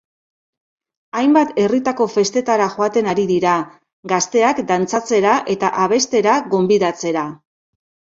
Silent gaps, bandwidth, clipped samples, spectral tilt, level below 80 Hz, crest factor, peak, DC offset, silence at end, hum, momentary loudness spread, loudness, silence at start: 3.93-4.03 s; 7.8 kHz; under 0.1%; -4.5 dB/octave; -60 dBFS; 16 dB; 0 dBFS; under 0.1%; 0.85 s; none; 6 LU; -17 LUFS; 1.15 s